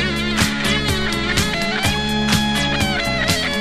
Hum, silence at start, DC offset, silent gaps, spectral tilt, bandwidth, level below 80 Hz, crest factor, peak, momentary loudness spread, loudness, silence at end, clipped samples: none; 0 s; 0.8%; none; -3.5 dB/octave; 14 kHz; -32 dBFS; 18 dB; 0 dBFS; 2 LU; -18 LUFS; 0 s; under 0.1%